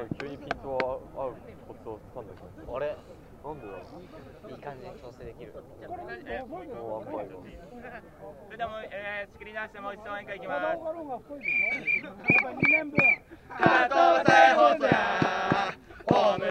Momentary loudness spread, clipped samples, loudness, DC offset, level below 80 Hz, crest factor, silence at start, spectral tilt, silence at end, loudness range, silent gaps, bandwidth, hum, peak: 24 LU; under 0.1%; -26 LUFS; under 0.1%; -56 dBFS; 26 dB; 0 s; -5.5 dB/octave; 0 s; 19 LU; none; 9.2 kHz; none; -4 dBFS